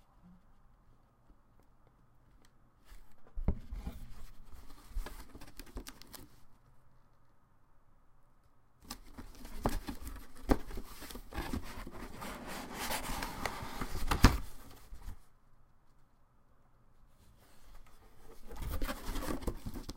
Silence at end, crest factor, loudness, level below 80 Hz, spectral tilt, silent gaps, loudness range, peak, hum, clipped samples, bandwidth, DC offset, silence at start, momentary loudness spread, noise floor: 0 s; 34 dB; -40 LUFS; -44 dBFS; -5 dB/octave; none; 20 LU; -6 dBFS; none; under 0.1%; 16.5 kHz; under 0.1%; 0.15 s; 22 LU; -64 dBFS